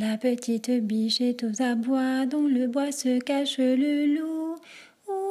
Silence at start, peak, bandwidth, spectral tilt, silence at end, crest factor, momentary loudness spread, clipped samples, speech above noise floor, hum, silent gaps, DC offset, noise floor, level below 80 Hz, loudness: 0 s; -14 dBFS; 14 kHz; -4 dB/octave; 0 s; 12 dB; 8 LU; under 0.1%; 25 dB; none; none; under 0.1%; -50 dBFS; -80 dBFS; -26 LUFS